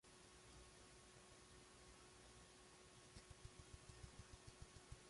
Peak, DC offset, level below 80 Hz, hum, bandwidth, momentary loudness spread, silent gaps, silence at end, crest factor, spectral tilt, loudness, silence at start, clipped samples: -42 dBFS; under 0.1%; -70 dBFS; none; 11.5 kHz; 3 LU; none; 0 s; 22 dB; -3.5 dB/octave; -64 LUFS; 0.05 s; under 0.1%